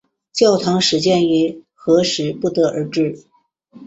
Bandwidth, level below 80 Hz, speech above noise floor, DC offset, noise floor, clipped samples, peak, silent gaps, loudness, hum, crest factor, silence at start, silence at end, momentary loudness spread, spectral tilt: 8.2 kHz; -58 dBFS; 31 dB; under 0.1%; -47 dBFS; under 0.1%; -2 dBFS; none; -17 LUFS; none; 16 dB; 0.35 s; 0 s; 8 LU; -5 dB/octave